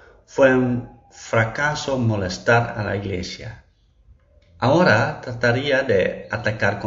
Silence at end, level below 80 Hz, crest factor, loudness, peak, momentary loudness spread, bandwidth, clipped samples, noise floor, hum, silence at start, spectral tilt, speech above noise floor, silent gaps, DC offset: 0 s; -48 dBFS; 18 dB; -20 LUFS; -4 dBFS; 12 LU; 7.6 kHz; under 0.1%; -54 dBFS; none; 0.3 s; -4.5 dB/octave; 34 dB; none; under 0.1%